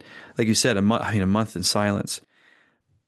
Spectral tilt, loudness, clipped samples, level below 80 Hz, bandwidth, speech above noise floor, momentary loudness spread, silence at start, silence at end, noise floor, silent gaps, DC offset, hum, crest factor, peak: -4.5 dB/octave; -23 LUFS; under 0.1%; -64 dBFS; 12.5 kHz; 42 dB; 11 LU; 0.1 s; 0.9 s; -64 dBFS; none; under 0.1%; none; 16 dB; -8 dBFS